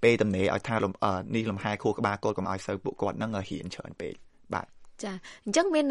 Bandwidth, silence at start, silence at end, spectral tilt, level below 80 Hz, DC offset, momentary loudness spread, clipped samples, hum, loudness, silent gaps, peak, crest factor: 11.5 kHz; 0 s; 0 s; -5.5 dB/octave; -60 dBFS; under 0.1%; 14 LU; under 0.1%; none; -30 LUFS; none; -8 dBFS; 20 dB